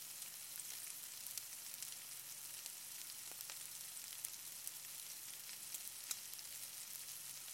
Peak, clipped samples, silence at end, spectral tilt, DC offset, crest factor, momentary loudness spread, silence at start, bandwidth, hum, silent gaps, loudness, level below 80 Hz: -20 dBFS; under 0.1%; 0 s; 1.5 dB/octave; under 0.1%; 32 dB; 2 LU; 0 s; 17 kHz; none; none; -48 LUFS; under -90 dBFS